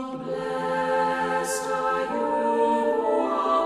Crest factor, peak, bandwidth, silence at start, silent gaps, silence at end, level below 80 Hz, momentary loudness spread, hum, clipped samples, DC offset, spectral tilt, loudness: 12 dB; -12 dBFS; 14 kHz; 0 s; none; 0 s; -60 dBFS; 6 LU; none; under 0.1%; under 0.1%; -4 dB/octave; -25 LUFS